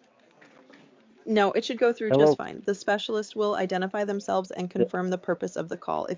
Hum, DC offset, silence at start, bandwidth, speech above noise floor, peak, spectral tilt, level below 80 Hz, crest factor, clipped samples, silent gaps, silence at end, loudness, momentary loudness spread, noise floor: none; under 0.1%; 1.25 s; 7.6 kHz; 31 dB; -8 dBFS; -5.5 dB/octave; -70 dBFS; 18 dB; under 0.1%; none; 0 s; -26 LUFS; 10 LU; -57 dBFS